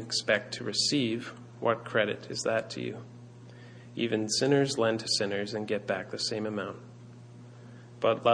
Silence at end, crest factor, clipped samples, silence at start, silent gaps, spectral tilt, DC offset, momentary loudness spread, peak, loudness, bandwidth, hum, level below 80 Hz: 0 s; 20 dB; under 0.1%; 0 s; none; -3.5 dB/octave; under 0.1%; 23 LU; -10 dBFS; -30 LUFS; 10.5 kHz; 60 Hz at -50 dBFS; -72 dBFS